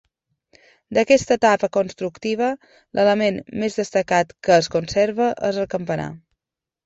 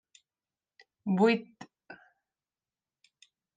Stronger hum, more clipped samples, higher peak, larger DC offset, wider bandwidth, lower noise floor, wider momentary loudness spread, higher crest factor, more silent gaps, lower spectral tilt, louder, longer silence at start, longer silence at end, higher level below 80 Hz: neither; neither; first, -2 dBFS vs -12 dBFS; neither; second, 8 kHz vs 9.2 kHz; about the same, -87 dBFS vs under -90 dBFS; second, 10 LU vs 27 LU; about the same, 18 dB vs 22 dB; neither; second, -5 dB/octave vs -7 dB/octave; first, -20 LUFS vs -28 LUFS; second, 0.9 s vs 1.05 s; second, 0.7 s vs 1.6 s; first, -54 dBFS vs -86 dBFS